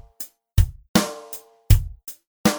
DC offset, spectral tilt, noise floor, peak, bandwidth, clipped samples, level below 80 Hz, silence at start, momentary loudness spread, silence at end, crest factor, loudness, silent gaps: under 0.1%; -5 dB/octave; -41 dBFS; 0 dBFS; over 20 kHz; under 0.1%; -26 dBFS; 0.2 s; 17 LU; 0 s; 22 dB; -22 LUFS; 0.89-0.94 s, 2.27-2.44 s